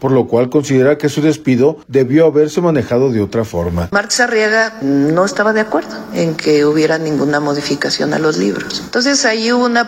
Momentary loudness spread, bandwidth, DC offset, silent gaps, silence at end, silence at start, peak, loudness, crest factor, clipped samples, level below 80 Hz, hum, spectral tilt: 6 LU; 16 kHz; under 0.1%; none; 0 s; 0 s; 0 dBFS; -14 LUFS; 12 dB; under 0.1%; -44 dBFS; none; -5 dB/octave